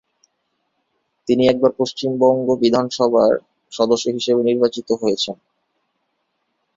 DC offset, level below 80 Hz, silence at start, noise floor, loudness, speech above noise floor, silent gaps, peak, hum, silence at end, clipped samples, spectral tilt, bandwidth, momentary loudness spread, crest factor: under 0.1%; -60 dBFS; 1.25 s; -71 dBFS; -18 LUFS; 54 dB; none; -2 dBFS; none; 1.4 s; under 0.1%; -5 dB/octave; 7.8 kHz; 8 LU; 18 dB